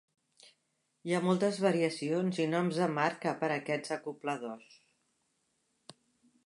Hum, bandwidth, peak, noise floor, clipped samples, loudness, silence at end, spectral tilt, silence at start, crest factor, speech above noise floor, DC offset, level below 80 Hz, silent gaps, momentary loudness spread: none; 11.5 kHz; -14 dBFS; -79 dBFS; under 0.1%; -32 LUFS; 1.9 s; -6 dB/octave; 1.05 s; 20 dB; 47 dB; under 0.1%; -84 dBFS; none; 10 LU